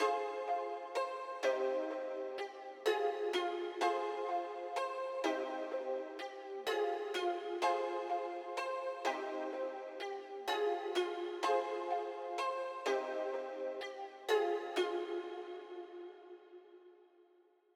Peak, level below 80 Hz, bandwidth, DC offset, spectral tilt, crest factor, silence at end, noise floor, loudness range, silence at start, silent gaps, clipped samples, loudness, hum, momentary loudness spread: -20 dBFS; under -90 dBFS; 15 kHz; under 0.1%; -1 dB/octave; 18 dB; 0.8 s; -69 dBFS; 2 LU; 0 s; none; under 0.1%; -39 LUFS; none; 10 LU